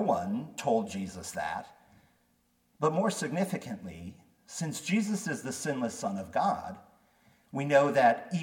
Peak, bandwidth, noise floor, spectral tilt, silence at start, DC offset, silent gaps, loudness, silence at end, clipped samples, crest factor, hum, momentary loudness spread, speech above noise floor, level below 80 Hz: -12 dBFS; 18 kHz; -71 dBFS; -5 dB/octave; 0 s; under 0.1%; none; -31 LUFS; 0 s; under 0.1%; 20 dB; none; 16 LU; 41 dB; -68 dBFS